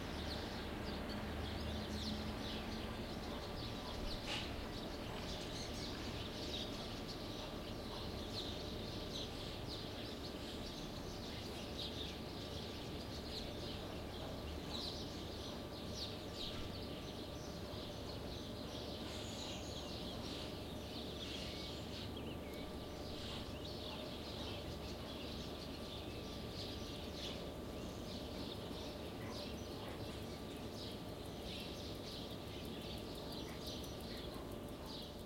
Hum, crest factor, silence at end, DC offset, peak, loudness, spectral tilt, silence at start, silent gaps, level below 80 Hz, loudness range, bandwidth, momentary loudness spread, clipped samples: none; 16 dB; 0 s; under 0.1%; -30 dBFS; -46 LUFS; -4.5 dB/octave; 0 s; none; -56 dBFS; 3 LU; 16.5 kHz; 4 LU; under 0.1%